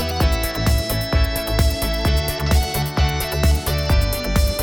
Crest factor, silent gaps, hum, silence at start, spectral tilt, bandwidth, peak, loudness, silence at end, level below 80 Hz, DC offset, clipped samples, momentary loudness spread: 14 dB; none; none; 0 s; -5 dB/octave; 20 kHz; -4 dBFS; -20 LUFS; 0 s; -22 dBFS; under 0.1%; under 0.1%; 2 LU